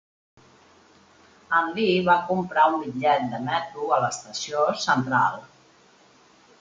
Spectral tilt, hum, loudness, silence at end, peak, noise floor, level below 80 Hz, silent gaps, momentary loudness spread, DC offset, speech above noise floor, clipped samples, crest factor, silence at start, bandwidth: -4.5 dB/octave; none; -23 LUFS; 1.15 s; -6 dBFS; -56 dBFS; -66 dBFS; none; 7 LU; under 0.1%; 33 dB; under 0.1%; 20 dB; 1.5 s; 9.4 kHz